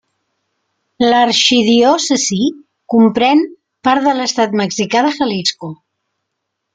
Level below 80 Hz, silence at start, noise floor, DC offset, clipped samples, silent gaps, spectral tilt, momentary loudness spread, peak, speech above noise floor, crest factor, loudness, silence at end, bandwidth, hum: -58 dBFS; 1 s; -74 dBFS; under 0.1%; under 0.1%; none; -3.5 dB/octave; 9 LU; 0 dBFS; 62 dB; 14 dB; -13 LUFS; 1 s; 9.4 kHz; none